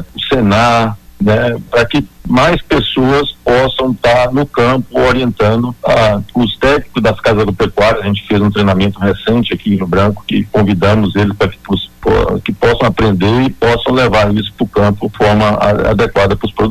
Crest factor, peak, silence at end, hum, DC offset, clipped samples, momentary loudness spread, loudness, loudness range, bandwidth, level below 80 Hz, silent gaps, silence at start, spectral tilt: 10 dB; -2 dBFS; 0 s; none; under 0.1%; under 0.1%; 4 LU; -12 LUFS; 1 LU; 14 kHz; -28 dBFS; none; 0 s; -6.5 dB/octave